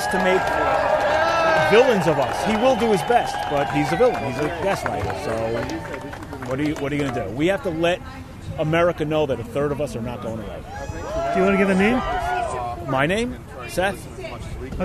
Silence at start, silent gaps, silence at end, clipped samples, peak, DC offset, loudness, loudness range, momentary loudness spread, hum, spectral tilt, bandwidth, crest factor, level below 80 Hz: 0 s; none; 0 s; under 0.1%; -4 dBFS; under 0.1%; -21 LUFS; 6 LU; 15 LU; none; -5.5 dB/octave; 14 kHz; 18 dB; -40 dBFS